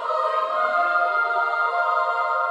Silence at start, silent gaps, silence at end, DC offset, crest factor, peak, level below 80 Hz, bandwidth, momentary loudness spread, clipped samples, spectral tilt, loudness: 0 s; none; 0 s; under 0.1%; 12 dB; -10 dBFS; under -90 dBFS; 10.5 kHz; 2 LU; under 0.1%; -1 dB/octave; -21 LUFS